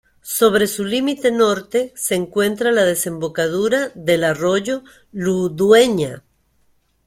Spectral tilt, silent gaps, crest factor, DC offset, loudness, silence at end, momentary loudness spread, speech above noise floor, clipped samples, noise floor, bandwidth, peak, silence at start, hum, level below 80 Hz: -4 dB/octave; none; 18 dB; under 0.1%; -18 LUFS; 0.9 s; 9 LU; 43 dB; under 0.1%; -60 dBFS; 16.5 kHz; 0 dBFS; 0.25 s; none; -56 dBFS